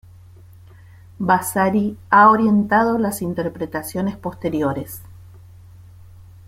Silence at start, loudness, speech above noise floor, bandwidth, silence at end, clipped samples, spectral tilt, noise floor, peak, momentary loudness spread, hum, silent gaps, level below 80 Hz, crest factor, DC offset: 1.2 s; -18 LUFS; 26 dB; 16 kHz; 1.25 s; under 0.1%; -6 dB/octave; -44 dBFS; -2 dBFS; 14 LU; none; none; -52 dBFS; 18 dB; under 0.1%